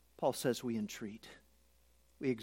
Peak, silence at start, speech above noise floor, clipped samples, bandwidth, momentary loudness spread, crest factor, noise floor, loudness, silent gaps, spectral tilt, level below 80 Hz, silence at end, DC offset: -20 dBFS; 0.2 s; 32 dB; under 0.1%; 16.5 kHz; 16 LU; 20 dB; -70 dBFS; -39 LUFS; none; -5 dB/octave; -72 dBFS; 0 s; under 0.1%